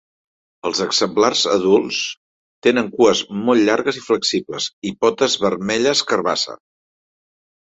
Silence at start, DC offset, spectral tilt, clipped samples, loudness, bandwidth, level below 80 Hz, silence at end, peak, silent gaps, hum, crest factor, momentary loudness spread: 0.65 s; under 0.1%; -3 dB/octave; under 0.1%; -18 LUFS; 8.2 kHz; -60 dBFS; 1.1 s; -2 dBFS; 2.17-2.62 s, 4.73-4.82 s; none; 18 dB; 8 LU